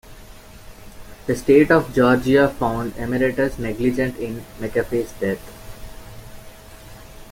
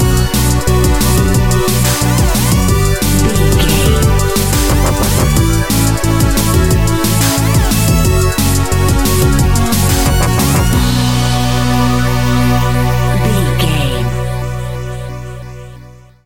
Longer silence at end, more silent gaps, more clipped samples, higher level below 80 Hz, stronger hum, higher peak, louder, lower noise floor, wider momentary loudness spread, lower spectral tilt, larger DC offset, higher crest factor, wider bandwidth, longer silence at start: about the same, 0 s vs 0 s; neither; neither; second, -40 dBFS vs -18 dBFS; neither; about the same, -2 dBFS vs 0 dBFS; second, -20 LUFS vs -12 LUFS; first, -41 dBFS vs -36 dBFS; first, 25 LU vs 6 LU; first, -6.5 dB/octave vs -5 dB/octave; second, under 0.1% vs 5%; first, 20 dB vs 12 dB; about the same, 17 kHz vs 17 kHz; about the same, 0.05 s vs 0 s